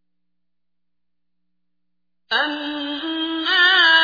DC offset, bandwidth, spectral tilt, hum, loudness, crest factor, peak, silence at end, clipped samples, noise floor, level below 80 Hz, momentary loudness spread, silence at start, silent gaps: under 0.1%; 5 kHz; -1 dB/octave; 60 Hz at -75 dBFS; -18 LUFS; 18 dB; -4 dBFS; 0 s; under 0.1%; -84 dBFS; -70 dBFS; 14 LU; 2.3 s; none